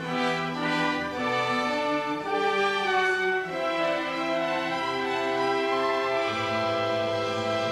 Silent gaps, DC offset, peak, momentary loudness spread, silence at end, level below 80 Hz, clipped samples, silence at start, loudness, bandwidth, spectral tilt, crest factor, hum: none; under 0.1%; -14 dBFS; 4 LU; 0 s; -64 dBFS; under 0.1%; 0 s; -26 LUFS; 14 kHz; -4.5 dB/octave; 12 dB; none